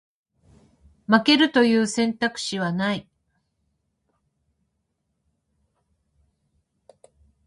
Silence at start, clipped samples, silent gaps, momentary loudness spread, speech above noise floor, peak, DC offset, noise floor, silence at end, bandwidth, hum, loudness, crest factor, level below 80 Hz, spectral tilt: 1.1 s; under 0.1%; none; 10 LU; 55 dB; -4 dBFS; under 0.1%; -76 dBFS; 4.45 s; 11.5 kHz; none; -21 LUFS; 24 dB; -64 dBFS; -4.5 dB/octave